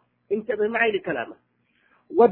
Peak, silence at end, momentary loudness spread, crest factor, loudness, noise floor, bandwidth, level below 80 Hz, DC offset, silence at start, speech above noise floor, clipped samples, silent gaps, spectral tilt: -4 dBFS; 0 s; 10 LU; 20 dB; -24 LUFS; -64 dBFS; 4.2 kHz; -66 dBFS; under 0.1%; 0.3 s; 39 dB; under 0.1%; none; -9 dB/octave